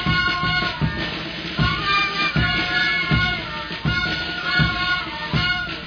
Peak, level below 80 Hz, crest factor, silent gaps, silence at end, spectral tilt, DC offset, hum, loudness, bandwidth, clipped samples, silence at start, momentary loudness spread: -4 dBFS; -36 dBFS; 16 dB; none; 0 s; -5 dB/octave; under 0.1%; none; -20 LUFS; 5.4 kHz; under 0.1%; 0 s; 7 LU